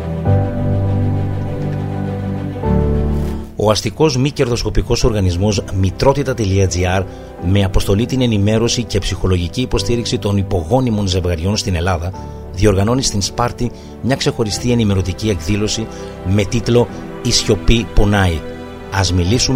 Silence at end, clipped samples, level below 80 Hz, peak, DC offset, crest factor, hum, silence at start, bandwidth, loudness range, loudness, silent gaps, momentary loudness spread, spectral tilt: 0 s; under 0.1%; -26 dBFS; 0 dBFS; under 0.1%; 16 dB; none; 0 s; 16 kHz; 2 LU; -17 LUFS; none; 7 LU; -5.5 dB/octave